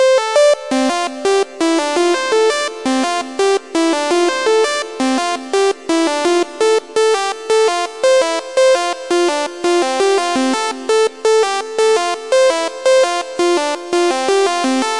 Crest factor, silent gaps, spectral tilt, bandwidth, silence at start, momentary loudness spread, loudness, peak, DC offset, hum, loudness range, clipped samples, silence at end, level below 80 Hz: 14 dB; none; -1.5 dB/octave; 11.5 kHz; 0 s; 4 LU; -15 LUFS; -2 dBFS; 0.5%; none; 1 LU; under 0.1%; 0 s; -70 dBFS